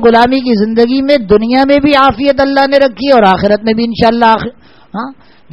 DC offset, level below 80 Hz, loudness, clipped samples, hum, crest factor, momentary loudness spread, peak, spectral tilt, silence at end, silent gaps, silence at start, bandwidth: 0.7%; -36 dBFS; -9 LUFS; 0.7%; none; 10 dB; 15 LU; 0 dBFS; -7 dB/octave; 0.4 s; none; 0 s; 9.6 kHz